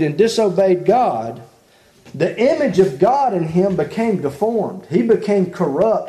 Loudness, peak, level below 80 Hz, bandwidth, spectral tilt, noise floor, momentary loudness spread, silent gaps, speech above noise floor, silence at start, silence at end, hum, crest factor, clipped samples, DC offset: -17 LUFS; -2 dBFS; -54 dBFS; 13 kHz; -7 dB/octave; -51 dBFS; 7 LU; none; 35 dB; 0 s; 0 s; none; 16 dB; under 0.1%; under 0.1%